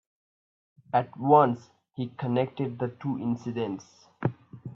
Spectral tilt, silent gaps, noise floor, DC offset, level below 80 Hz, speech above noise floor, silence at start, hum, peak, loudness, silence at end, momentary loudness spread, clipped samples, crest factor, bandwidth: -8.5 dB/octave; none; under -90 dBFS; under 0.1%; -70 dBFS; over 63 dB; 0.95 s; none; -6 dBFS; -28 LUFS; 0.05 s; 16 LU; under 0.1%; 22 dB; 7.2 kHz